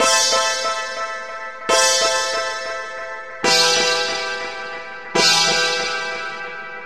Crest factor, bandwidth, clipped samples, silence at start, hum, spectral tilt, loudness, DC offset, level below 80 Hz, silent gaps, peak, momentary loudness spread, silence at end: 18 dB; 16 kHz; under 0.1%; 0 s; none; 0 dB/octave; -18 LUFS; 0.8%; -58 dBFS; none; -2 dBFS; 16 LU; 0 s